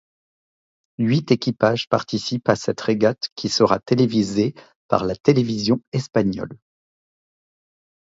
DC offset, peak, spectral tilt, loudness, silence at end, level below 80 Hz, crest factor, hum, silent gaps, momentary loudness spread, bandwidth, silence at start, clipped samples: under 0.1%; -2 dBFS; -6 dB/octave; -21 LUFS; 1.55 s; -54 dBFS; 20 dB; none; 3.32-3.36 s, 4.75-4.89 s, 5.20-5.24 s, 5.87-5.92 s; 6 LU; 7.8 kHz; 1 s; under 0.1%